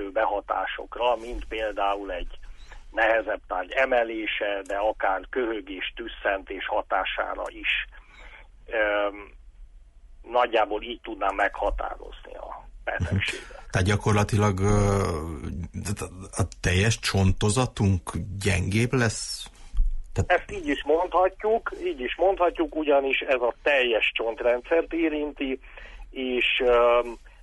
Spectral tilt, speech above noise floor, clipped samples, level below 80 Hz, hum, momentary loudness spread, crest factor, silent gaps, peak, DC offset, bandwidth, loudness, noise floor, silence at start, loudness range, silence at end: -5 dB/octave; 23 dB; under 0.1%; -38 dBFS; none; 12 LU; 16 dB; none; -10 dBFS; under 0.1%; 11.5 kHz; -26 LUFS; -49 dBFS; 0 s; 5 LU; 0 s